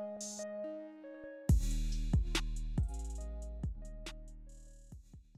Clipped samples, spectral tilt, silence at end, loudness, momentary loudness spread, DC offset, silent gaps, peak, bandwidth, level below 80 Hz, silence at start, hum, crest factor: under 0.1%; -5.5 dB/octave; 0.15 s; -39 LUFS; 23 LU; under 0.1%; none; -20 dBFS; 14 kHz; -40 dBFS; 0 s; none; 18 dB